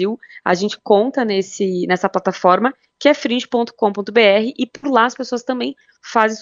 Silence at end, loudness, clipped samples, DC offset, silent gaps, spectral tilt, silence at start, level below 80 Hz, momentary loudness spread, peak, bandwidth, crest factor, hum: 0 s; -17 LUFS; under 0.1%; under 0.1%; none; -4.5 dB/octave; 0 s; -66 dBFS; 9 LU; 0 dBFS; 7.8 kHz; 16 dB; none